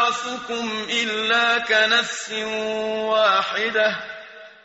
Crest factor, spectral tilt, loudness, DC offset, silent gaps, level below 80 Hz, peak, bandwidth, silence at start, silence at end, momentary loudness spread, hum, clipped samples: 16 dB; 1 dB/octave; -20 LUFS; under 0.1%; none; -64 dBFS; -6 dBFS; 8 kHz; 0 s; 0.15 s; 10 LU; none; under 0.1%